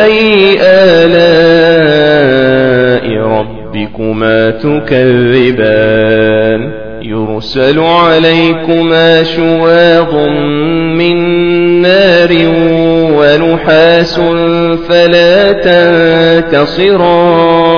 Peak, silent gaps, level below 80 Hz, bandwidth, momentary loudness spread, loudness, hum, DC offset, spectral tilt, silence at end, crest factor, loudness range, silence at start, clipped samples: 0 dBFS; none; -36 dBFS; 5.4 kHz; 7 LU; -7 LUFS; none; 2%; -7 dB/octave; 0 s; 6 dB; 3 LU; 0 s; 2%